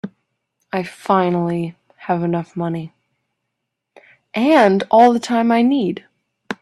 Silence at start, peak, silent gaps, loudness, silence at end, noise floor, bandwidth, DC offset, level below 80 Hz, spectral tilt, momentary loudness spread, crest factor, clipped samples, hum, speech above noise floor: 0.05 s; 0 dBFS; none; -17 LUFS; 0.1 s; -77 dBFS; 12 kHz; under 0.1%; -62 dBFS; -7 dB/octave; 18 LU; 18 dB; under 0.1%; none; 61 dB